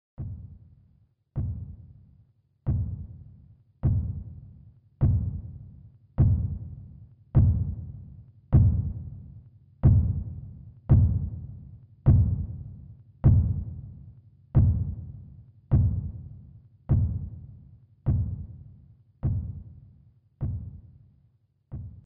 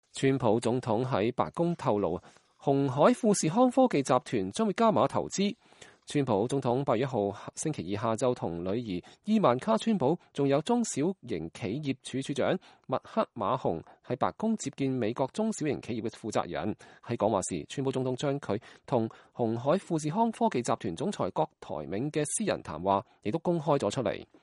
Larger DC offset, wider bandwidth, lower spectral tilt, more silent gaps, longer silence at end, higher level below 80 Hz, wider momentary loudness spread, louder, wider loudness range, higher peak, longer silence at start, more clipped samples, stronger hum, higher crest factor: neither; second, 2.2 kHz vs 11.5 kHz; first, -14 dB/octave vs -5.5 dB/octave; neither; second, 0.05 s vs 0.2 s; first, -34 dBFS vs -64 dBFS; first, 24 LU vs 10 LU; first, -27 LUFS vs -30 LUFS; first, 9 LU vs 5 LU; about the same, -10 dBFS vs -10 dBFS; about the same, 0.2 s vs 0.15 s; neither; neither; about the same, 18 dB vs 20 dB